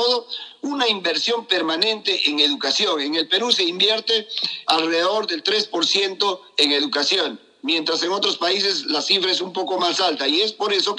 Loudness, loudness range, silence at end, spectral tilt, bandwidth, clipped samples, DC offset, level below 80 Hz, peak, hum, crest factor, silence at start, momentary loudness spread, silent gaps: -19 LUFS; 1 LU; 0 s; -1.5 dB/octave; 11.5 kHz; under 0.1%; under 0.1%; under -90 dBFS; 0 dBFS; none; 20 dB; 0 s; 5 LU; none